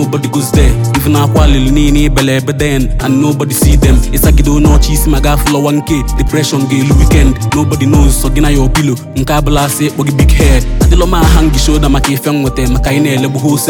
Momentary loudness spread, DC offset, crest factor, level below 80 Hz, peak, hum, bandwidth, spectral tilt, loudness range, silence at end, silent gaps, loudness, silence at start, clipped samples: 4 LU; under 0.1%; 8 dB; -12 dBFS; 0 dBFS; none; 19 kHz; -5.5 dB/octave; 1 LU; 0 s; none; -10 LUFS; 0 s; under 0.1%